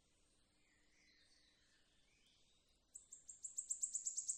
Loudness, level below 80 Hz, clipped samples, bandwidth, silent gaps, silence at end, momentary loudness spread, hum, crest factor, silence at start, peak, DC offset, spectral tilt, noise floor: -44 LUFS; -84 dBFS; under 0.1%; 14.5 kHz; none; 0 s; 18 LU; none; 24 dB; 1.3 s; -30 dBFS; under 0.1%; 2 dB/octave; -77 dBFS